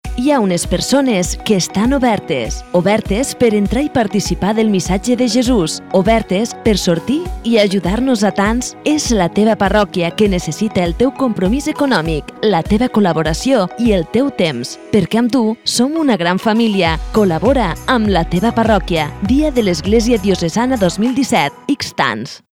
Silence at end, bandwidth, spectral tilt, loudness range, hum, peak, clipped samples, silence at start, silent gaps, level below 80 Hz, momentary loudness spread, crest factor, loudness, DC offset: 0.15 s; 16 kHz; -5 dB/octave; 1 LU; none; 0 dBFS; under 0.1%; 0.05 s; none; -30 dBFS; 4 LU; 14 dB; -15 LUFS; under 0.1%